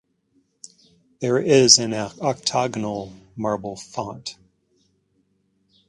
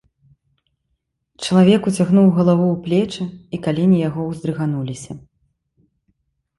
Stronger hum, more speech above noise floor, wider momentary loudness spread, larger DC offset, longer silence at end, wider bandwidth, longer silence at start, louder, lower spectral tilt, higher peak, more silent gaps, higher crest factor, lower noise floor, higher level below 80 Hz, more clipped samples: neither; second, 46 dB vs 56 dB; first, 19 LU vs 15 LU; neither; first, 1.55 s vs 1.4 s; about the same, 11.5 kHz vs 11.5 kHz; second, 1.2 s vs 1.4 s; second, -20 LUFS vs -17 LUFS; second, -3 dB/octave vs -7 dB/octave; about the same, 0 dBFS vs -2 dBFS; neither; first, 24 dB vs 16 dB; second, -67 dBFS vs -72 dBFS; second, -62 dBFS vs -54 dBFS; neither